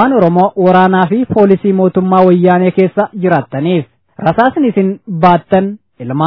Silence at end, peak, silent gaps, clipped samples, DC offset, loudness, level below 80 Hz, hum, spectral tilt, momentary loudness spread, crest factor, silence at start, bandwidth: 0 s; 0 dBFS; none; 0.8%; 0.2%; -11 LUFS; -48 dBFS; none; -10.5 dB/octave; 8 LU; 10 dB; 0 s; 5.4 kHz